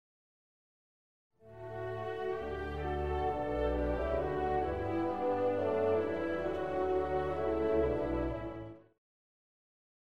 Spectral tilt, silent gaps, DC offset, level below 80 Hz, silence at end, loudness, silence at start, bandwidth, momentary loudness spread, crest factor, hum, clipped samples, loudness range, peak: -8.5 dB/octave; none; 0.2%; -46 dBFS; 1.05 s; -34 LUFS; 1.3 s; 8.6 kHz; 9 LU; 14 dB; none; under 0.1%; 5 LU; -20 dBFS